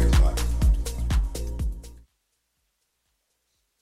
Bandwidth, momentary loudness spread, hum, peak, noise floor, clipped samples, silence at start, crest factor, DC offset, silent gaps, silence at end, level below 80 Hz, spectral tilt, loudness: 14.5 kHz; 11 LU; none; -10 dBFS; -75 dBFS; under 0.1%; 0 s; 16 dB; under 0.1%; none; 1.85 s; -26 dBFS; -5.5 dB/octave; -26 LUFS